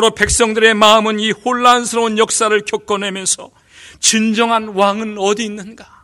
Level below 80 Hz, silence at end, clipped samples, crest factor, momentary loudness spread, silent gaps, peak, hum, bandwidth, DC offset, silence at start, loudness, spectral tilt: -38 dBFS; 0.2 s; 0.2%; 14 dB; 9 LU; none; 0 dBFS; none; over 20 kHz; under 0.1%; 0 s; -13 LUFS; -2 dB/octave